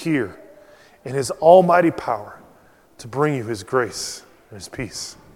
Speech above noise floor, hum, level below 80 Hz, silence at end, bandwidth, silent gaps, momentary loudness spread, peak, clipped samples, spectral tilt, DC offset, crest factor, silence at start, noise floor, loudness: 33 dB; none; -56 dBFS; 0.2 s; 16 kHz; none; 24 LU; 0 dBFS; under 0.1%; -5 dB/octave; under 0.1%; 20 dB; 0 s; -52 dBFS; -19 LUFS